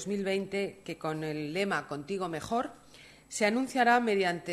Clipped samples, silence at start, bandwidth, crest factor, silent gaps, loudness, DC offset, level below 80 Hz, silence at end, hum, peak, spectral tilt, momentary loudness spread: under 0.1%; 0 s; 13 kHz; 18 dB; none; -31 LUFS; under 0.1%; -66 dBFS; 0 s; none; -12 dBFS; -4.5 dB/octave; 12 LU